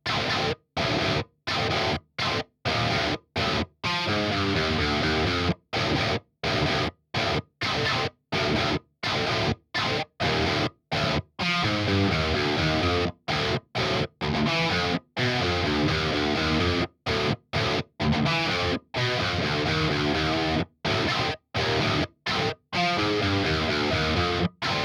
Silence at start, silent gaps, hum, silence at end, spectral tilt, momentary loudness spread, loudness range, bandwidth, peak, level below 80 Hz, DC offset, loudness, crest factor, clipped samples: 0.05 s; none; none; 0 s; -5 dB/octave; 4 LU; 1 LU; 15.5 kHz; -12 dBFS; -46 dBFS; under 0.1%; -25 LUFS; 14 dB; under 0.1%